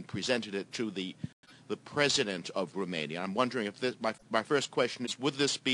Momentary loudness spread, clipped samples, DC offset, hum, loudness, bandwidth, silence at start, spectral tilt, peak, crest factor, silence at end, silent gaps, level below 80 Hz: 10 LU; under 0.1%; under 0.1%; none; -32 LUFS; 11.5 kHz; 0 s; -3.5 dB/octave; -12 dBFS; 22 dB; 0 s; 1.33-1.43 s; -72 dBFS